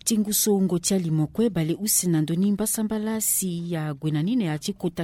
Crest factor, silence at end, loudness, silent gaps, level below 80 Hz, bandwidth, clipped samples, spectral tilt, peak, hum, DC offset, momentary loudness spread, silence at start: 16 dB; 0 s; -24 LUFS; none; -56 dBFS; 16.5 kHz; under 0.1%; -4.5 dB/octave; -8 dBFS; none; under 0.1%; 7 LU; 0.05 s